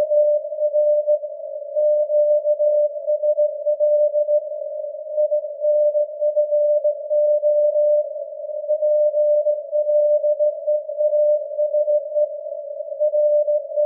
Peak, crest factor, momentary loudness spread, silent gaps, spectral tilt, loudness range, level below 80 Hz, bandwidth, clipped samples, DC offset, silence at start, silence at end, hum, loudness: -10 dBFS; 10 dB; 10 LU; none; -8 dB/octave; 1 LU; under -90 dBFS; 0.7 kHz; under 0.1%; under 0.1%; 0 s; 0 s; none; -20 LUFS